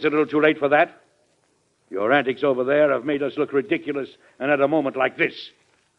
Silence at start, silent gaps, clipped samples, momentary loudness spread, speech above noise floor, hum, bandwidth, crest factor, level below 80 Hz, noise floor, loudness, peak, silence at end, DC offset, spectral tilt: 0 s; none; under 0.1%; 11 LU; 44 dB; none; 6.2 kHz; 18 dB; -70 dBFS; -65 dBFS; -21 LUFS; -4 dBFS; 0.5 s; under 0.1%; -7 dB/octave